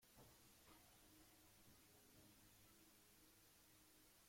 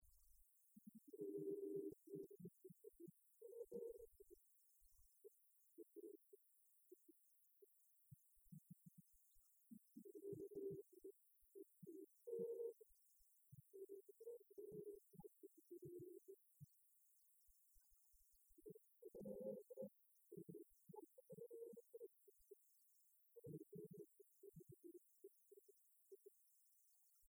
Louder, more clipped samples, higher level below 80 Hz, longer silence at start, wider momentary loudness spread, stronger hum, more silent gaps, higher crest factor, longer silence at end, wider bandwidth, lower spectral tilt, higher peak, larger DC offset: second, -69 LUFS vs -59 LUFS; neither; first, -82 dBFS vs -88 dBFS; about the same, 0 s vs 0 s; second, 1 LU vs 16 LU; neither; neither; about the same, 16 dB vs 20 dB; about the same, 0 s vs 0 s; second, 16.5 kHz vs over 20 kHz; second, -3 dB/octave vs -8 dB/octave; second, -54 dBFS vs -40 dBFS; neither